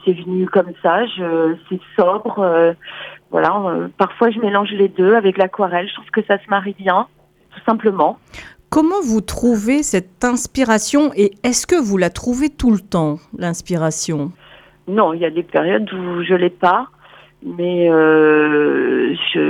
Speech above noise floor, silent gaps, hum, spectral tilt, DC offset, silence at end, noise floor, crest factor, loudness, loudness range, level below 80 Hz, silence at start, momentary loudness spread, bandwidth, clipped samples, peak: 29 dB; none; none; -5 dB/octave; under 0.1%; 0 s; -45 dBFS; 16 dB; -16 LUFS; 3 LU; -44 dBFS; 0.05 s; 10 LU; 16 kHz; under 0.1%; -2 dBFS